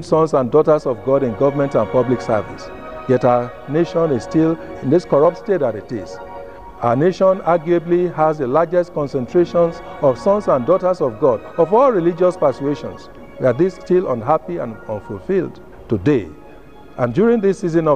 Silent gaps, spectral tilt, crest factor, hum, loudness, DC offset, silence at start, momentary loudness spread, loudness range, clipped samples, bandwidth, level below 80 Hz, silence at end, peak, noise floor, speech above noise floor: none; -8 dB/octave; 16 dB; none; -17 LUFS; 0.7%; 0 s; 13 LU; 4 LU; under 0.1%; 9.4 kHz; -48 dBFS; 0 s; -2 dBFS; -41 dBFS; 25 dB